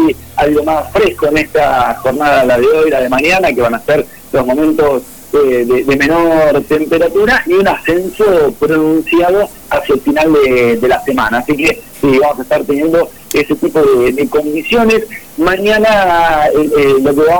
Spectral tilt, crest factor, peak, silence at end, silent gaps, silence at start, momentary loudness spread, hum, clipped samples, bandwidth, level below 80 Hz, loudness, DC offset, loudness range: -5.5 dB/octave; 8 dB; -4 dBFS; 0 s; none; 0 s; 5 LU; none; under 0.1%; 19.5 kHz; -36 dBFS; -11 LUFS; 0.8%; 1 LU